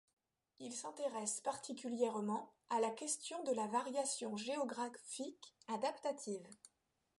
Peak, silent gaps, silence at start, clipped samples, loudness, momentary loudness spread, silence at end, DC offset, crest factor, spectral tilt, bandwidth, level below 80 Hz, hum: -24 dBFS; none; 0.6 s; under 0.1%; -42 LUFS; 10 LU; 0.5 s; under 0.1%; 18 dB; -3 dB/octave; 11.5 kHz; under -90 dBFS; none